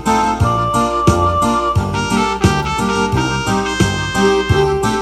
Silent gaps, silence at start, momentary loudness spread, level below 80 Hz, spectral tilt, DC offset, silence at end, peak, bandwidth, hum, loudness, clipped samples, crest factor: none; 0 s; 3 LU; -28 dBFS; -5 dB/octave; under 0.1%; 0 s; 0 dBFS; 13.5 kHz; none; -15 LUFS; under 0.1%; 14 dB